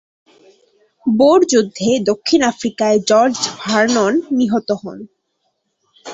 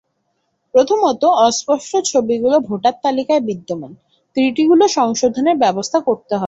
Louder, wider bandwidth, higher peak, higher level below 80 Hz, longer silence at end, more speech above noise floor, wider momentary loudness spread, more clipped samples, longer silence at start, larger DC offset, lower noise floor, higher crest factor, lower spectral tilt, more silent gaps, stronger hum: about the same, -15 LUFS vs -16 LUFS; about the same, 8.2 kHz vs 8 kHz; about the same, -2 dBFS vs -2 dBFS; about the same, -58 dBFS vs -60 dBFS; about the same, 0 s vs 0 s; about the same, 54 dB vs 53 dB; first, 11 LU vs 7 LU; neither; first, 1.05 s vs 0.75 s; neither; about the same, -69 dBFS vs -68 dBFS; about the same, 16 dB vs 14 dB; about the same, -4 dB/octave vs -4 dB/octave; neither; neither